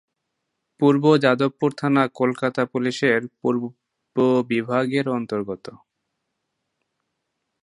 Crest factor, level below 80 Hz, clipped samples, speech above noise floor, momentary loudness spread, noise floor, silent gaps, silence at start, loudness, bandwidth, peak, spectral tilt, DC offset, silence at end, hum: 22 dB; -68 dBFS; under 0.1%; 58 dB; 11 LU; -78 dBFS; none; 0.8 s; -21 LUFS; 11 kHz; -2 dBFS; -7 dB/octave; under 0.1%; 1.85 s; none